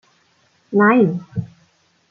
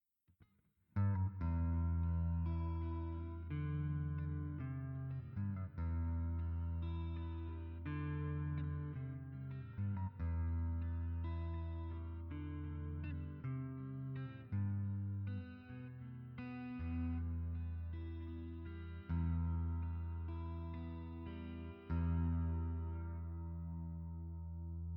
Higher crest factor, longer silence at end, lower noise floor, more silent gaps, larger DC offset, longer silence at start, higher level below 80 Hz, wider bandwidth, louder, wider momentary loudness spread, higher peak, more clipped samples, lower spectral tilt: about the same, 16 dB vs 14 dB; first, 0.65 s vs 0 s; second, -59 dBFS vs -76 dBFS; neither; neither; first, 0.7 s vs 0.4 s; second, -60 dBFS vs -48 dBFS; first, 5.6 kHz vs 4 kHz; first, -17 LUFS vs -43 LUFS; first, 16 LU vs 10 LU; first, -2 dBFS vs -28 dBFS; neither; second, -9.5 dB/octave vs -11 dB/octave